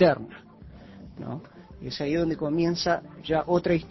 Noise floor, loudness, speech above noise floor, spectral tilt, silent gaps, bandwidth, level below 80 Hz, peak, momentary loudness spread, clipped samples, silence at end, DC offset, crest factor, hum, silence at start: -47 dBFS; -27 LUFS; 22 dB; -6.5 dB/octave; none; 6.2 kHz; -52 dBFS; -6 dBFS; 22 LU; under 0.1%; 0 s; under 0.1%; 20 dB; none; 0 s